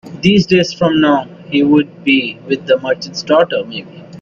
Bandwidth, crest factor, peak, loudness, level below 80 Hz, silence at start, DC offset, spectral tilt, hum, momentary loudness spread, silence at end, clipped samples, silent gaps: 7.2 kHz; 14 dB; 0 dBFS; -14 LUFS; -50 dBFS; 0.05 s; under 0.1%; -6 dB/octave; none; 9 LU; 0 s; under 0.1%; none